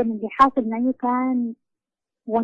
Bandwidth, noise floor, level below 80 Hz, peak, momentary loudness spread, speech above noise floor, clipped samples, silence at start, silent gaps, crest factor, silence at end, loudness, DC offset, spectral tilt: 7.6 kHz; -87 dBFS; -56 dBFS; -4 dBFS; 10 LU; 66 dB; under 0.1%; 0 s; none; 18 dB; 0 s; -21 LUFS; under 0.1%; -7.5 dB/octave